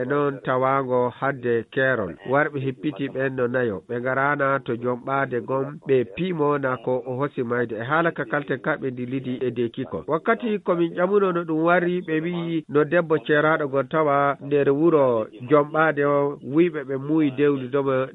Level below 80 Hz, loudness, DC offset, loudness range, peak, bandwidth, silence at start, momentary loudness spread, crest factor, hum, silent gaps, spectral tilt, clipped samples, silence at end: -64 dBFS; -23 LUFS; under 0.1%; 4 LU; -4 dBFS; 4 kHz; 0 s; 7 LU; 18 dB; none; none; -9.5 dB/octave; under 0.1%; 0 s